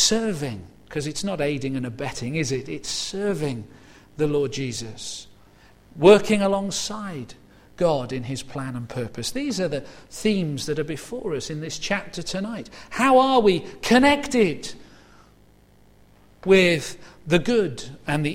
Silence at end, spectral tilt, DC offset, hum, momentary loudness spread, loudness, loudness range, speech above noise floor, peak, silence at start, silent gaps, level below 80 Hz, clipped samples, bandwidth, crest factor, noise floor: 0 s; -4.5 dB/octave; under 0.1%; 50 Hz at -50 dBFS; 17 LU; -23 LUFS; 7 LU; 32 dB; 0 dBFS; 0 s; none; -50 dBFS; under 0.1%; 16 kHz; 22 dB; -54 dBFS